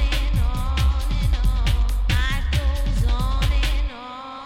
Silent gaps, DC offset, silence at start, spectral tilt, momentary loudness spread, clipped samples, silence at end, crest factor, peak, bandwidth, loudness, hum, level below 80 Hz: none; under 0.1%; 0 s; -5 dB/octave; 3 LU; under 0.1%; 0 s; 12 dB; -8 dBFS; 15.5 kHz; -23 LUFS; none; -20 dBFS